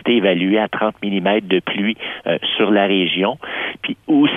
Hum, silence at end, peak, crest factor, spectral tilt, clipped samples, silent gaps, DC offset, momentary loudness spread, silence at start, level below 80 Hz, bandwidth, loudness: none; 0 s; -2 dBFS; 14 dB; -7.5 dB/octave; under 0.1%; none; under 0.1%; 8 LU; 0.05 s; -60 dBFS; 3.8 kHz; -18 LUFS